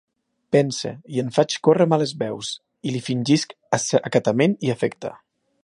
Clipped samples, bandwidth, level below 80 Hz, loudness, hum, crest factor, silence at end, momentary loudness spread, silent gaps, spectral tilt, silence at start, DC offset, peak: under 0.1%; 11.5 kHz; -66 dBFS; -22 LUFS; none; 20 dB; 0.5 s; 11 LU; none; -5 dB/octave; 0.5 s; under 0.1%; -2 dBFS